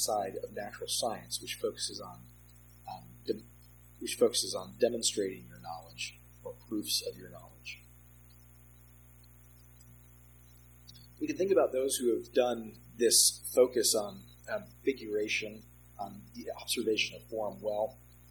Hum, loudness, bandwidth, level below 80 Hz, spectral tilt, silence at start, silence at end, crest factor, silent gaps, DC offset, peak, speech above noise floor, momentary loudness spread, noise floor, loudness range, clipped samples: 60 Hz at -55 dBFS; -32 LUFS; 19.5 kHz; -62 dBFS; -2 dB/octave; 0 s; 0.35 s; 22 dB; none; under 0.1%; -12 dBFS; 24 dB; 20 LU; -57 dBFS; 12 LU; under 0.1%